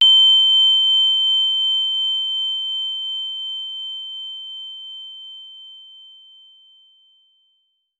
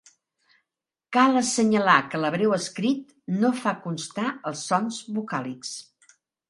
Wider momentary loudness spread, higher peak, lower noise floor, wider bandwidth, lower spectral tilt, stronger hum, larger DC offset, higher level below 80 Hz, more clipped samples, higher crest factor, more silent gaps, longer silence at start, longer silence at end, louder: first, 23 LU vs 12 LU; second, -6 dBFS vs -2 dBFS; second, -68 dBFS vs -88 dBFS; second, 7.6 kHz vs 11.5 kHz; second, 6.5 dB/octave vs -4.5 dB/octave; neither; neither; second, under -90 dBFS vs -72 dBFS; neither; second, 14 dB vs 22 dB; neither; second, 0 s vs 1.1 s; first, 2 s vs 0.65 s; first, -15 LUFS vs -24 LUFS